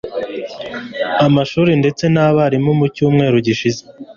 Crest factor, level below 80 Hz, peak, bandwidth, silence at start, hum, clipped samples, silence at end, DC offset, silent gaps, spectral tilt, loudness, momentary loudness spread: 14 dB; -50 dBFS; -2 dBFS; 7.2 kHz; 0.05 s; none; under 0.1%; 0.05 s; under 0.1%; none; -7 dB/octave; -15 LUFS; 13 LU